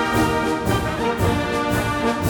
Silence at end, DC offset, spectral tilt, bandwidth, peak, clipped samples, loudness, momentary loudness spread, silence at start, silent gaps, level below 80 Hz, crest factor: 0 s; under 0.1%; -5.5 dB/octave; over 20 kHz; -6 dBFS; under 0.1%; -21 LUFS; 2 LU; 0 s; none; -36 dBFS; 14 dB